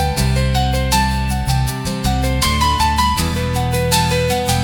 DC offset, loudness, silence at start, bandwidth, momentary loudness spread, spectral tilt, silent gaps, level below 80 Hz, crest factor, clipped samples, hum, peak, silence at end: under 0.1%; -17 LUFS; 0 s; 19 kHz; 4 LU; -4.5 dB/octave; none; -24 dBFS; 16 dB; under 0.1%; none; 0 dBFS; 0 s